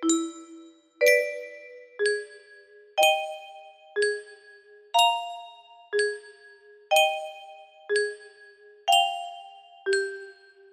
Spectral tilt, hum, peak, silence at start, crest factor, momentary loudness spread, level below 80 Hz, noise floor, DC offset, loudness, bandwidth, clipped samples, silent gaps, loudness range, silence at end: 0.5 dB/octave; none; -6 dBFS; 0 s; 22 dB; 23 LU; -78 dBFS; -53 dBFS; under 0.1%; -25 LUFS; 15.5 kHz; under 0.1%; none; 2 LU; 0.4 s